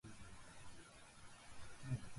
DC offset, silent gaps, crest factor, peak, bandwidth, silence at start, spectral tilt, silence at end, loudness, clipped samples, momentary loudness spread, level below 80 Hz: under 0.1%; none; 20 dB; -32 dBFS; 11.5 kHz; 0.05 s; -5 dB/octave; 0 s; -56 LUFS; under 0.1%; 13 LU; -66 dBFS